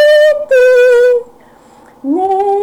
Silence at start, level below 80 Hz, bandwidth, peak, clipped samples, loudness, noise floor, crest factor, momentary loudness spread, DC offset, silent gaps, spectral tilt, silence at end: 0 s; -52 dBFS; 13.5 kHz; -4 dBFS; under 0.1%; -9 LUFS; -42 dBFS; 6 dB; 10 LU; under 0.1%; none; -2.5 dB/octave; 0 s